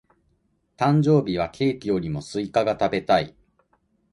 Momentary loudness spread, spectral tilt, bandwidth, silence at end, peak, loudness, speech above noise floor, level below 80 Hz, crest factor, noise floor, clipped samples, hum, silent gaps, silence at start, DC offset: 8 LU; -7 dB/octave; 11 kHz; 0.85 s; -6 dBFS; -23 LUFS; 46 dB; -52 dBFS; 18 dB; -68 dBFS; under 0.1%; none; none; 0.8 s; under 0.1%